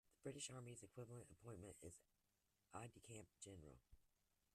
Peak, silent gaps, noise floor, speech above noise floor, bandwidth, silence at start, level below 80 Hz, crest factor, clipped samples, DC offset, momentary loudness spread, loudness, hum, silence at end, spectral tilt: -40 dBFS; none; -88 dBFS; 29 dB; 13.5 kHz; 0.05 s; -80 dBFS; 20 dB; under 0.1%; under 0.1%; 9 LU; -59 LUFS; none; 0.5 s; -4 dB/octave